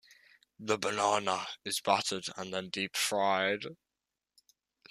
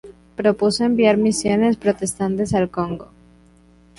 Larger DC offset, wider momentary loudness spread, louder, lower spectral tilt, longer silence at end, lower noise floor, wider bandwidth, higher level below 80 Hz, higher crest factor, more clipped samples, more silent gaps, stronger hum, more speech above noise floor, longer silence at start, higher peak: neither; about the same, 9 LU vs 10 LU; second, -32 LUFS vs -19 LUFS; second, -2 dB/octave vs -5 dB/octave; first, 1.15 s vs 0.95 s; first, -89 dBFS vs -51 dBFS; first, 15 kHz vs 11.5 kHz; second, -78 dBFS vs -48 dBFS; first, 22 dB vs 16 dB; neither; neither; neither; first, 57 dB vs 33 dB; first, 0.6 s vs 0.05 s; second, -12 dBFS vs -4 dBFS